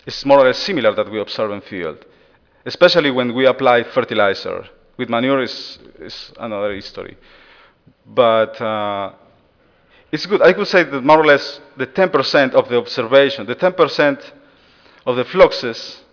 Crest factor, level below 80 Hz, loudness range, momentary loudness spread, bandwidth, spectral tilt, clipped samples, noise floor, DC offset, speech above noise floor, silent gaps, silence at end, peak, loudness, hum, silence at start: 16 dB; -52 dBFS; 7 LU; 17 LU; 5.4 kHz; -5.5 dB/octave; under 0.1%; -55 dBFS; under 0.1%; 39 dB; none; 0.15 s; 0 dBFS; -16 LUFS; none; 0.05 s